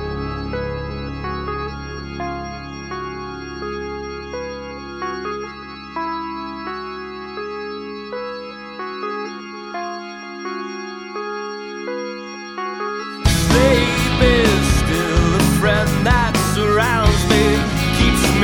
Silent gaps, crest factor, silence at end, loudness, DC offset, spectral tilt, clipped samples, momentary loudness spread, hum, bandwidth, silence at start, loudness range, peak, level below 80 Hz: none; 18 dB; 0 s; -20 LUFS; under 0.1%; -5 dB/octave; under 0.1%; 15 LU; none; 17.5 kHz; 0 s; 13 LU; 0 dBFS; -28 dBFS